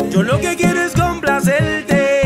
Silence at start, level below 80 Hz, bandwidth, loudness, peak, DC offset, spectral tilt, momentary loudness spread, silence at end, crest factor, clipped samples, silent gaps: 0 s; -36 dBFS; 16 kHz; -15 LUFS; -4 dBFS; under 0.1%; -5.5 dB/octave; 2 LU; 0 s; 12 dB; under 0.1%; none